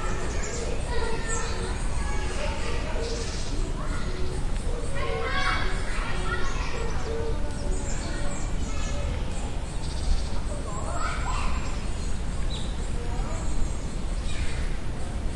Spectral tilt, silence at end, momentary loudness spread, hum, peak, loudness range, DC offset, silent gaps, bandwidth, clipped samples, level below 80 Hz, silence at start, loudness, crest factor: -4.5 dB/octave; 0 s; 4 LU; none; -12 dBFS; 2 LU; under 0.1%; none; 11.5 kHz; under 0.1%; -30 dBFS; 0 s; -31 LUFS; 14 dB